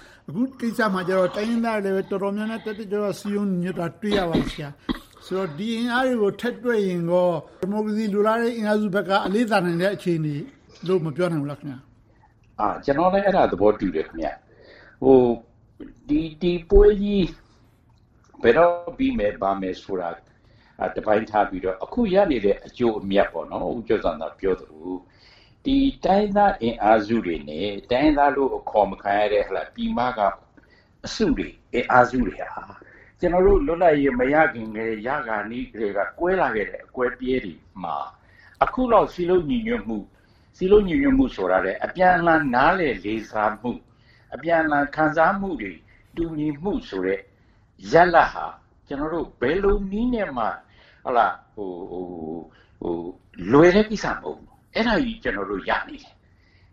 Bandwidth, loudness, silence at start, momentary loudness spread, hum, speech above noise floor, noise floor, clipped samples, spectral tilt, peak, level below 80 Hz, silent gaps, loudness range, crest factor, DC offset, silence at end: 13.5 kHz; -22 LUFS; 0.3 s; 15 LU; none; 35 dB; -57 dBFS; under 0.1%; -6.5 dB/octave; 0 dBFS; -38 dBFS; none; 5 LU; 22 dB; under 0.1%; 0.75 s